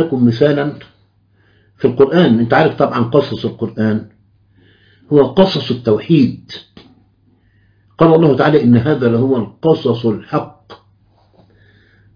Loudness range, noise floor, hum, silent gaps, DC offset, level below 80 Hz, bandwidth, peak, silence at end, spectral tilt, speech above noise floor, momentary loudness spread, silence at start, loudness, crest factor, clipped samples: 3 LU; -54 dBFS; none; none; under 0.1%; -50 dBFS; 5.2 kHz; 0 dBFS; 1.4 s; -9 dB/octave; 42 dB; 11 LU; 0 s; -13 LUFS; 14 dB; under 0.1%